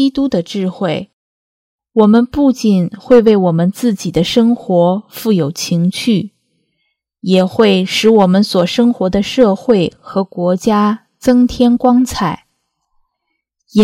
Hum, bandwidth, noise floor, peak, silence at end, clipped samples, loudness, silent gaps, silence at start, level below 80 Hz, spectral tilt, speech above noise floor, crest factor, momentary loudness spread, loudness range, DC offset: none; 16 kHz; -72 dBFS; 0 dBFS; 0 s; under 0.1%; -13 LUFS; 1.13-1.79 s; 0 s; -44 dBFS; -6 dB/octave; 60 dB; 12 dB; 9 LU; 3 LU; under 0.1%